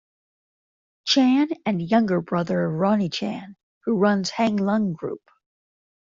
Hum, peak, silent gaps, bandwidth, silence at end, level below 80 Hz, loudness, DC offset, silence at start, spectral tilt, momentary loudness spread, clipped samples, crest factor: none; -6 dBFS; 3.63-3.81 s; 7.6 kHz; 0.9 s; -64 dBFS; -22 LUFS; under 0.1%; 1.05 s; -5.5 dB/octave; 13 LU; under 0.1%; 18 dB